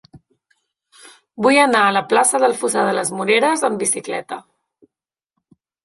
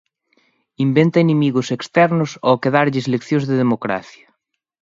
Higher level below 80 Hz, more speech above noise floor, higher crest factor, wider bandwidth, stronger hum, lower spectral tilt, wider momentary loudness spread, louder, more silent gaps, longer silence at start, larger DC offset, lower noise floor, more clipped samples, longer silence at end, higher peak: about the same, -66 dBFS vs -62 dBFS; first, 71 dB vs 54 dB; about the same, 18 dB vs 18 dB; first, 12 kHz vs 7.8 kHz; neither; second, -2.5 dB/octave vs -7 dB/octave; first, 12 LU vs 7 LU; about the same, -16 LUFS vs -17 LUFS; neither; second, 0.15 s vs 0.8 s; neither; first, -88 dBFS vs -71 dBFS; neither; first, 1.45 s vs 0.85 s; about the same, -2 dBFS vs 0 dBFS